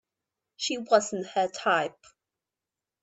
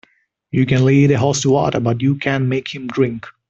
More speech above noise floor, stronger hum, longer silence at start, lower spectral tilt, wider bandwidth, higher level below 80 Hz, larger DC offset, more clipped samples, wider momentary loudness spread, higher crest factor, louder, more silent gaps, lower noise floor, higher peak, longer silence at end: first, 62 dB vs 39 dB; neither; about the same, 0.6 s vs 0.55 s; second, -2.5 dB/octave vs -6 dB/octave; about the same, 8.4 kHz vs 7.8 kHz; second, -80 dBFS vs -50 dBFS; neither; neither; about the same, 8 LU vs 8 LU; first, 22 dB vs 14 dB; second, -27 LUFS vs -17 LUFS; neither; first, -90 dBFS vs -55 dBFS; second, -8 dBFS vs -2 dBFS; first, 1.1 s vs 0.2 s